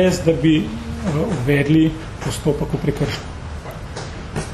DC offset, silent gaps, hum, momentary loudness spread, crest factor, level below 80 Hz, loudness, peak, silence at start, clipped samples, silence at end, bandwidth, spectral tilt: under 0.1%; none; none; 15 LU; 18 dB; -34 dBFS; -20 LUFS; -2 dBFS; 0 s; under 0.1%; 0 s; 13 kHz; -6.5 dB/octave